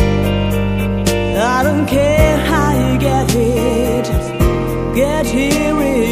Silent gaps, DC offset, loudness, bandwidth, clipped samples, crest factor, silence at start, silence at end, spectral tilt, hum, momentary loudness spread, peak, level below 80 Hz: none; under 0.1%; -15 LUFS; 15.5 kHz; under 0.1%; 14 dB; 0 s; 0 s; -6 dB/octave; none; 4 LU; 0 dBFS; -24 dBFS